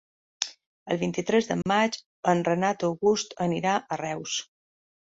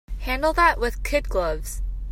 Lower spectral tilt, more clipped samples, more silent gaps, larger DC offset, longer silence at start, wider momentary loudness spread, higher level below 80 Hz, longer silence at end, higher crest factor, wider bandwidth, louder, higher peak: about the same, -4.5 dB/octave vs -4.5 dB/octave; neither; first, 0.66-0.86 s, 2.06-2.23 s vs none; neither; first, 0.4 s vs 0.1 s; second, 8 LU vs 12 LU; second, -64 dBFS vs -30 dBFS; first, 0.65 s vs 0 s; about the same, 22 dB vs 20 dB; second, 8 kHz vs 16 kHz; second, -27 LUFS vs -23 LUFS; about the same, -6 dBFS vs -4 dBFS